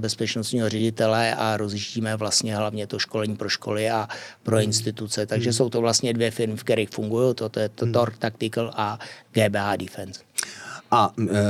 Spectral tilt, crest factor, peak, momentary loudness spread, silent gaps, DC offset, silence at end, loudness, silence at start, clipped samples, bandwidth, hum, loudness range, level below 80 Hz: -4.5 dB/octave; 18 dB; -6 dBFS; 8 LU; none; under 0.1%; 0 s; -24 LUFS; 0 s; under 0.1%; 15.5 kHz; none; 2 LU; -72 dBFS